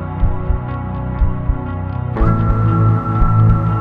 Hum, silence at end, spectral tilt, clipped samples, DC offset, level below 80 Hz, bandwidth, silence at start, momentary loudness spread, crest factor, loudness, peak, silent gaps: none; 0 s; -11 dB/octave; under 0.1%; 0.7%; -20 dBFS; 3.7 kHz; 0 s; 9 LU; 14 dB; -17 LUFS; -2 dBFS; none